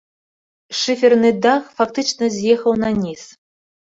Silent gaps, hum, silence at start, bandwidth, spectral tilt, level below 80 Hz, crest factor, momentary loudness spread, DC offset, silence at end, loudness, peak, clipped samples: none; none; 0.7 s; 7.8 kHz; -4 dB/octave; -54 dBFS; 16 dB; 10 LU; under 0.1%; 0.7 s; -17 LUFS; -2 dBFS; under 0.1%